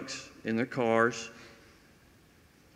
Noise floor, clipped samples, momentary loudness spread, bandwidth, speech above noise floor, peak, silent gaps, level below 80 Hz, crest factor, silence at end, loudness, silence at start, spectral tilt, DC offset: -61 dBFS; under 0.1%; 17 LU; 15 kHz; 31 dB; -12 dBFS; none; -68 dBFS; 22 dB; 1.2 s; -30 LUFS; 0 s; -4.5 dB/octave; under 0.1%